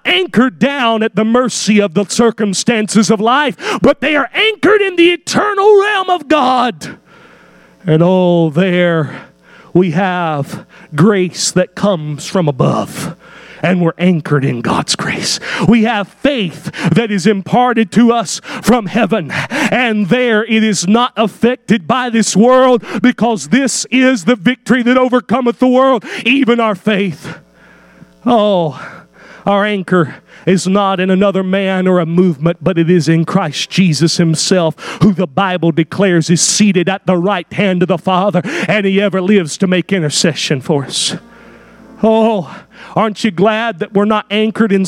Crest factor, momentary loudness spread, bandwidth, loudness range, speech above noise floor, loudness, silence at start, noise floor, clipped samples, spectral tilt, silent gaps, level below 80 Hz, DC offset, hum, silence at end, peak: 12 dB; 6 LU; 15 kHz; 4 LU; 31 dB; -12 LUFS; 0.05 s; -43 dBFS; under 0.1%; -5 dB/octave; none; -50 dBFS; under 0.1%; none; 0 s; 0 dBFS